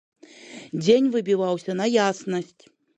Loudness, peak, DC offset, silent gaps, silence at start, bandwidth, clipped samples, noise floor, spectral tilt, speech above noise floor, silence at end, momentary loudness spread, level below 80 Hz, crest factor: -23 LUFS; -6 dBFS; under 0.1%; none; 0.45 s; 9.6 kHz; under 0.1%; -44 dBFS; -5.5 dB/octave; 22 dB; 0.55 s; 21 LU; -74 dBFS; 18 dB